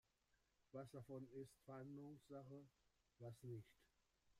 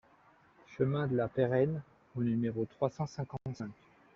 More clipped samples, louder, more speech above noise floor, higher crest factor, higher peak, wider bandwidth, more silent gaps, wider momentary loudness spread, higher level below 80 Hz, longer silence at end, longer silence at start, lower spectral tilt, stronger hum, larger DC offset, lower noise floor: neither; second, -59 LUFS vs -34 LUFS; about the same, 28 dB vs 31 dB; about the same, 16 dB vs 18 dB; second, -44 dBFS vs -16 dBFS; first, 15 kHz vs 7.2 kHz; neither; second, 5 LU vs 13 LU; second, -86 dBFS vs -66 dBFS; second, 0 s vs 0.45 s; about the same, 0.75 s vs 0.7 s; about the same, -7.5 dB/octave vs -8 dB/octave; neither; neither; first, -86 dBFS vs -64 dBFS